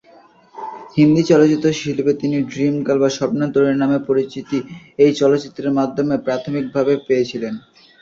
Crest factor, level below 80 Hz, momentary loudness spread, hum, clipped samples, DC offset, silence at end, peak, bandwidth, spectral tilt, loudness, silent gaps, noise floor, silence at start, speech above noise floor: 16 dB; -58 dBFS; 11 LU; none; under 0.1%; under 0.1%; 0.4 s; -2 dBFS; 7.6 kHz; -6.5 dB/octave; -17 LUFS; none; -48 dBFS; 0.55 s; 32 dB